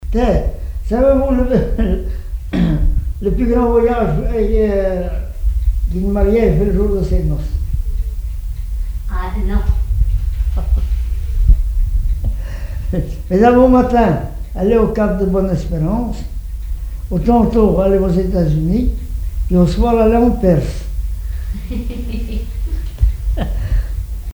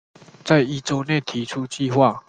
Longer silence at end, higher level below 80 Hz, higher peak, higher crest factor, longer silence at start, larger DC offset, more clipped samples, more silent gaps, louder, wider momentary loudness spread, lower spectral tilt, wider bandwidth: about the same, 0 s vs 0.1 s; first, -18 dBFS vs -60 dBFS; about the same, 0 dBFS vs -2 dBFS; second, 14 dB vs 20 dB; second, 0 s vs 0.45 s; neither; neither; neither; first, -17 LUFS vs -21 LUFS; first, 12 LU vs 9 LU; first, -9 dB/octave vs -5.5 dB/octave; first, over 20 kHz vs 9.6 kHz